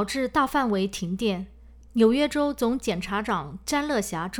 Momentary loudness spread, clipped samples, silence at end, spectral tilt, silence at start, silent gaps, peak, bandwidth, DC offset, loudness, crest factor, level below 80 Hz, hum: 8 LU; under 0.1%; 0 s; -5 dB/octave; 0 s; none; -8 dBFS; over 20 kHz; under 0.1%; -25 LUFS; 18 dB; -48 dBFS; none